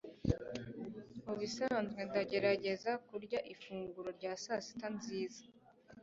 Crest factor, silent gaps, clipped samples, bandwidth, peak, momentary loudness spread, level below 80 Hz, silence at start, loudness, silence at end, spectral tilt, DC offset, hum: 24 dB; none; under 0.1%; 7.6 kHz; -18 dBFS; 12 LU; -62 dBFS; 0.05 s; -40 LUFS; 0 s; -4.5 dB/octave; under 0.1%; none